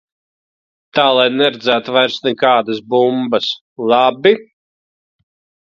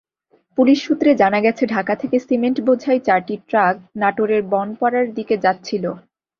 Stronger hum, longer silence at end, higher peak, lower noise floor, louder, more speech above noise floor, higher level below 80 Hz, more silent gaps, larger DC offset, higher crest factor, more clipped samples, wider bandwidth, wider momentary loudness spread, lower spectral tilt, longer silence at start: neither; first, 1.25 s vs 0.4 s; about the same, 0 dBFS vs -2 dBFS; first, under -90 dBFS vs -61 dBFS; first, -14 LUFS vs -18 LUFS; first, over 76 dB vs 43 dB; about the same, -64 dBFS vs -62 dBFS; first, 3.61-3.76 s vs none; neither; about the same, 16 dB vs 16 dB; neither; about the same, 7.4 kHz vs 7 kHz; about the same, 7 LU vs 7 LU; second, -5 dB/octave vs -6.5 dB/octave; first, 0.95 s vs 0.55 s